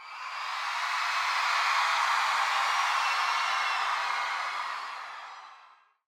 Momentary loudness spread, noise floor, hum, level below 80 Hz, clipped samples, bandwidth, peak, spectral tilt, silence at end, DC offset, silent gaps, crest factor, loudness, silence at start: 13 LU; -58 dBFS; none; -80 dBFS; under 0.1%; 17 kHz; -14 dBFS; 3 dB/octave; 0.45 s; under 0.1%; none; 16 dB; -28 LUFS; 0 s